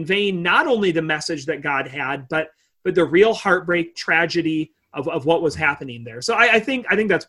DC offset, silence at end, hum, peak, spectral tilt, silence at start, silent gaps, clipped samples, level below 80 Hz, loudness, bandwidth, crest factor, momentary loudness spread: under 0.1%; 0.05 s; none; -2 dBFS; -4.5 dB/octave; 0 s; none; under 0.1%; -54 dBFS; -19 LUFS; 12 kHz; 18 dB; 11 LU